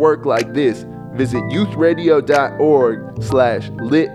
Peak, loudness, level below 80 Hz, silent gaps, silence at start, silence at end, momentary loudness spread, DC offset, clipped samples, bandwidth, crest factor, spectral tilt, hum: 0 dBFS; -16 LUFS; -48 dBFS; none; 0 s; 0 s; 9 LU; under 0.1%; under 0.1%; 12.5 kHz; 14 dB; -7 dB/octave; none